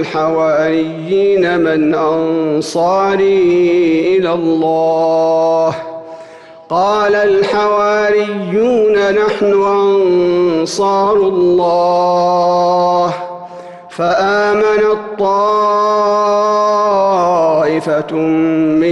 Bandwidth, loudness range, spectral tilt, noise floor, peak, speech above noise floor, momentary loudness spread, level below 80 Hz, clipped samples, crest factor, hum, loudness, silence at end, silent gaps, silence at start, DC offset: 11.5 kHz; 2 LU; -6 dB/octave; -35 dBFS; -4 dBFS; 23 dB; 5 LU; -52 dBFS; under 0.1%; 8 dB; none; -12 LUFS; 0 s; none; 0 s; under 0.1%